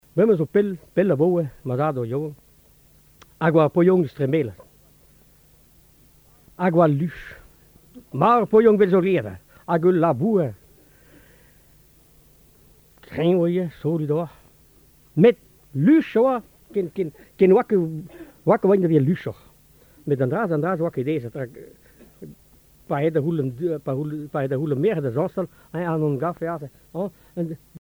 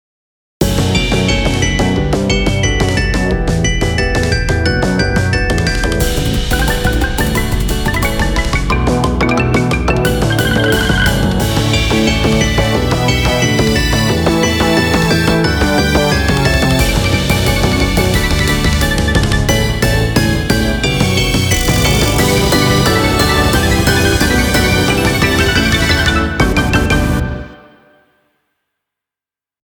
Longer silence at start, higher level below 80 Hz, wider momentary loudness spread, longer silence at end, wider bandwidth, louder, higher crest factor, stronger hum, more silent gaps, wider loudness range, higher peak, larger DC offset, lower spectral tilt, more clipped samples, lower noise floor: second, 0.15 s vs 0.6 s; second, -58 dBFS vs -20 dBFS; first, 14 LU vs 4 LU; second, 0.05 s vs 2.15 s; about the same, over 20 kHz vs over 20 kHz; second, -21 LUFS vs -13 LUFS; first, 20 dB vs 12 dB; neither; neither; first, 7 LU vs 3 LU; about the same, -2 dBFS vs 0 dBFS; neither; first, -9 dB/octave vs -4.5 dB/octave; neither; second, -55 dBFS vs -89 dBFS